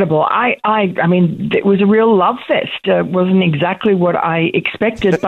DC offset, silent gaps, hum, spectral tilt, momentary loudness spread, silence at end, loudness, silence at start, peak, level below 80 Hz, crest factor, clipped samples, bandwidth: under 0.1%; none; none; -8 dB/octave; 5 LU; 0 s; -14 LUFS; 0 s; -2 dBFS; -48 dBFS; 10 dB; under 0.1%; 6.8 kHz